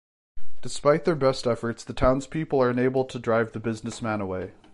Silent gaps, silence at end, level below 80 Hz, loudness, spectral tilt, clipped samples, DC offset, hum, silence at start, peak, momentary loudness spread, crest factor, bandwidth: none; 0 s; -44 dBFS; -25 LUFS; -6 dB/octave; under 0.1%; under 0.1%; none; 0.35 s; -8 dBFS; 10 LU; 16 dB; 11.5 kHz